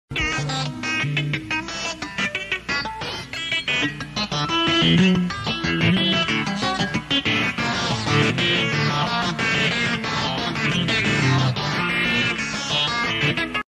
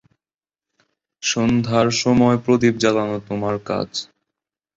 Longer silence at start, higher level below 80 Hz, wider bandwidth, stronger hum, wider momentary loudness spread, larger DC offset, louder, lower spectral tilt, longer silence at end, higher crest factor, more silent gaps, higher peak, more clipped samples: second, 0.1 s vs 1.2 s; about the same, -46 dBFS vs -50 dBFS; first, 13 kHz vs 7.8 kHz; neither; about the same, 7 LU vs 9 LU; neither; about the same, -21 LUFS vs -19 LUFS; about the same, -4.5 dB/octave vs -5 dB/octave; second, 0.1 s vs 0.7 s; about the same, 16 dB vs 18 dB; neither; second, -6 dBFS vs -2 dBFS; neither